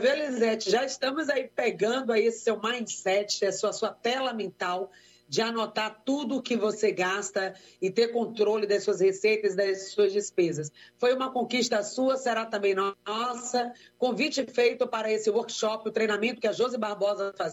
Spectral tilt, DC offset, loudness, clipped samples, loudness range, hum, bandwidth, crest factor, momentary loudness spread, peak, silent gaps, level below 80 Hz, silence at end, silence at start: -3.5 dB/octave; under 0.1%; -28 LUFS; under 0.1%; 3 LU; none; 13.5 kHz; 16 dB; 6 LU; -12 dBFS; none; -80 dBFS; 0 s; 0 s